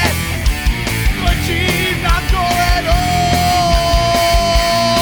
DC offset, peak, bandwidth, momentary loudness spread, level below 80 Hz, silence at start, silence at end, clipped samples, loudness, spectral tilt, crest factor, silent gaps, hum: under 0.1%; -2 dBFS; over 20 kHz; 4 LU; -18 dBFS; 0 s; 0 s; under 0.1%; -14 LUFS; -4 dB/octave; 12 dB; none; none